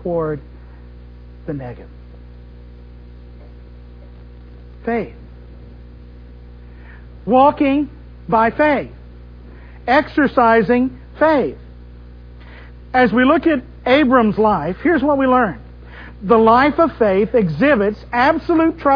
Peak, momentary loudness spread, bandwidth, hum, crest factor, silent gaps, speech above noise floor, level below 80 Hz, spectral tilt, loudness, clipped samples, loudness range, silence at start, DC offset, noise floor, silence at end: 0 dBFS; 18 LU; 5.4 kHz; 60 Hz at -35 dBFS; 16 dB; none; 23 dB; -38 dBFS; -8.5 dB/octave; -15 LUFS; under 0.1%; 16 LU; 0 s; under 0.1%; -38 dBFS; 0 s